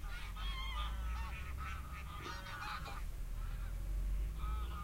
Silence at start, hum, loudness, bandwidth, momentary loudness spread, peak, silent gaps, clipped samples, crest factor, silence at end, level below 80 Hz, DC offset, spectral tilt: 0 s; none; -45 LUFS; 16 kHz; 5 LU; -30 dBFS; none; under 0.1%; 12 dB; 0 s; -42 dBFS; under 0.1%; -4.5 dB/octave